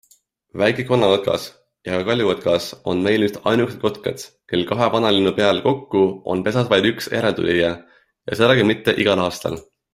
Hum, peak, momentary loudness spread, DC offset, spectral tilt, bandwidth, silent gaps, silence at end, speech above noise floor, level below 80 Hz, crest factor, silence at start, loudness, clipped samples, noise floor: none; 0 dBFS; 12 LU; under 0.1%; -5.5 dB/octave; 15.5 kHz; none; 0.3 s; 39 dB; -54 dBFS; 18 dB; 0.55 s; -19 LUFS; under 0.1%; -58 dBFS